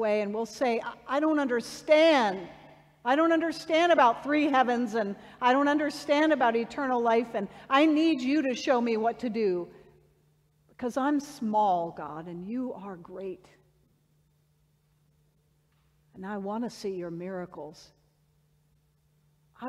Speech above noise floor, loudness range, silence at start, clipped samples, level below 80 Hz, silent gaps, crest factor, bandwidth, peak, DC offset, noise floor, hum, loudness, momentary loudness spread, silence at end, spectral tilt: 41 dB; 16 LU; 0 s; under 0.1%; -70 dBFS; none; 18 dB; 13 kHz; -10 dBFS; under 0.1%; -68 dBFS; none; -27 LUFS; 17 LU; 0 s; -5 dB/octave